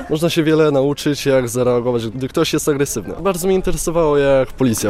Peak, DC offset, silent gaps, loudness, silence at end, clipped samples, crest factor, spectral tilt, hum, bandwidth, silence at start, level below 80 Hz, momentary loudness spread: -4 dBFS; under 0.1%; none; -17 LUFS; 0 s; under 0.1%; 12 dB; -5 dB/octave; none; 16 kHz; 0 s; -34 dBFS; 7 LU